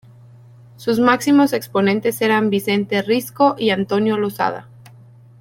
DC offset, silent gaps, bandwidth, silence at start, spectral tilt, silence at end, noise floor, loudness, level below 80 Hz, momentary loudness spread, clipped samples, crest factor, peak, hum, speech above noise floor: under 0.1%; none; 17 kHz; 0.8 s; -5.5 dB/octave; 0.8 s; -44 dBFS; -18 LUFS; -62 dBFS; 7 LU; under 0.1%; 16 dB; -2 dBFS; none; 27 dB